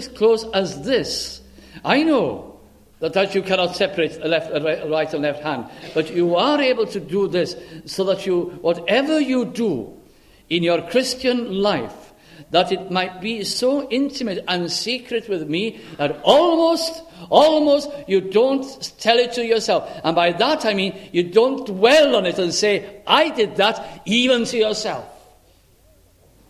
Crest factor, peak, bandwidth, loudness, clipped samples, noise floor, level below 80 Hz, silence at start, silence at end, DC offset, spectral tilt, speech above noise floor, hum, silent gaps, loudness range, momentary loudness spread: 20 dB; 0 dBFS; 14.5 kHz; -19 LUFS; under 0.1%; -54 dBFS; -56 dBFS; 0 s; 1.35 s; under 0.1%; -4 dB/octave; 35 dB; none; none; 4 LU; 10 LU